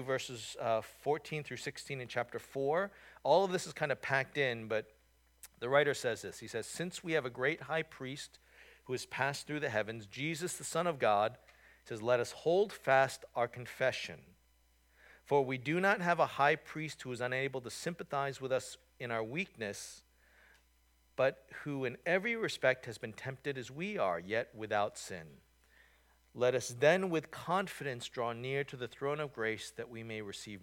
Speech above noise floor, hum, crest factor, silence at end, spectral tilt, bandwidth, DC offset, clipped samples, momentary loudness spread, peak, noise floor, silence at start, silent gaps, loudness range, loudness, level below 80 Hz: 35 dB; none; 22 dB; 0 s; -4.5 dB/octave; 18 kHz; under 0.1%; under 0.1%; 13 LU; -14 dBFS; -70 dBFS; 0 s; none; 5 LU; -36 LUFS; -72 dBFS